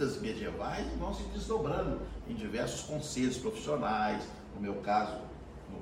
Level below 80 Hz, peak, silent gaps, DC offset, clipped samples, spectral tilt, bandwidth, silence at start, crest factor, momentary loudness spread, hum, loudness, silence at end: -48 dBFS; -18 dBFS; none; under 0.1%; under 0.1%; -5 dB/octave; 16 kHz; 0 s; 18 dB; 9 LU; none; -36 LUFS; 0 s